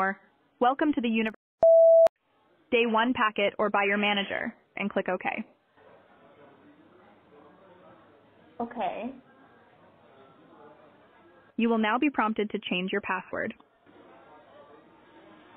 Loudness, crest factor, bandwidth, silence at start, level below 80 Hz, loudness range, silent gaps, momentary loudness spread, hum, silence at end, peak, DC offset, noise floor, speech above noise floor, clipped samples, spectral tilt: -26 LUFS; 18 dB; 4.1 kHz; 0 s; -70 dBFS; 17 LU; 1.36-1.58 s, 2.09-2.16 s; 16 LU; none; 2.05 s; -12 dBFS; under 0.1%; -66 dBFS; 39 dB; under 0.1%; -2.5 dB/octave